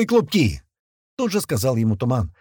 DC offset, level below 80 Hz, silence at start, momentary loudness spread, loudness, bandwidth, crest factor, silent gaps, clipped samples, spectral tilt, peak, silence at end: under 0.1%; -42 dBFS; 0 s; 11 LU; -21 LUFS; 19 kHz; 14 dB; 0.80-1.17 s; under 0.1%; -6 dB/octave; -6 dBFS; 0.1 s